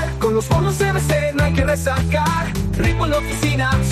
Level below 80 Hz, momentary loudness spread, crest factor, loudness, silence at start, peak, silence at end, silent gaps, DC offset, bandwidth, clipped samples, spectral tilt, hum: -28 dBFS; 2 LU; 12 dB; -18 LUFS; 0 s; -6 dBFS; 0 s; none; under 0.1%; 14 kHz; under 0.1%; -5.5 dB/octave; none